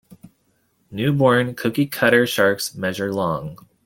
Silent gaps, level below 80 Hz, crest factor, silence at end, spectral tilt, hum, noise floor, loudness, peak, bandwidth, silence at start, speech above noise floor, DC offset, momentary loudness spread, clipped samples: none; -58 dBFS; 18 dB; 0.3 s; -5 dB/octave; none; -65 dBFS; -19 LUFS; -2 dBFS; 17 kHz; 0.25 s; 46 dB; under 0.1%; 9 LU; under 0.1%